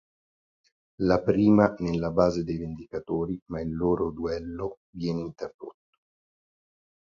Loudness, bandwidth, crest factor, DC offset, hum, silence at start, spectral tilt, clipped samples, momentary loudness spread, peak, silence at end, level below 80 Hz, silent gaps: -27 LUFS; 7.4 kHz; 22 dB; under 0.1%; none; 1 s; -8 dB/octave; under 0.1%; 16 LU; -6 dBFS; 1.5 s; -50 dBFS; 3.42-3.46 s, 4.77-4.93 s, 5.54-5.59 s